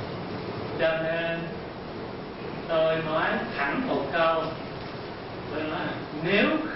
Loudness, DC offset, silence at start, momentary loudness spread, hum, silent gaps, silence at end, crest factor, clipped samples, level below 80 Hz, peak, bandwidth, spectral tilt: -28 LUFS; under 0.1%; 0 s; 13 LU; none; none; 0 s; 18 dB; under 0.1%; -54 dBFS; -10 dBFS; 5.8 kHz; -9.5 dB/octave